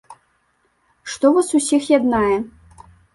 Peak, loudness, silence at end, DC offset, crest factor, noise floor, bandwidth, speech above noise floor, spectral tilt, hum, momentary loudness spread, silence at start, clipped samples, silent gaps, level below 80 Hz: -2 dBFS; -17 LUFS; 0.65 s; under 0.1%; 18 dB; -64 dBFS; 11.5 kHz; 48 dB; -4 dB/octave; none; 17 LU; 0.1 s; under 0.1%; none; -50 dBFS